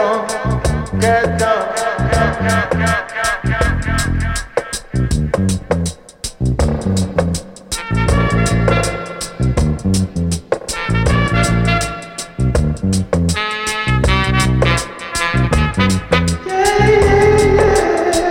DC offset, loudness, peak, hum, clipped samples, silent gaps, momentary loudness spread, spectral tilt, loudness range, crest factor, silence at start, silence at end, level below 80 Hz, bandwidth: under 0.1%; -16 LUFS; 0 dBFS; none; under 0.1%; none; 9 LU; -5 dB/octave; 5 LU; 16 dB; 0 s; 0 s; -24 dBFS; 16.5 kHz